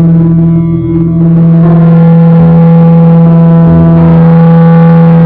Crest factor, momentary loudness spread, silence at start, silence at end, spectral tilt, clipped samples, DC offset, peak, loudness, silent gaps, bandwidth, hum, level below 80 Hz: 2 dB; 4 LU; 0 s; 0 s; -13.5 dB/octave; 10%; under 0.1%; 0 dBFS; -4 LUFS; none; 3.2 kHz; none; -28 dBFS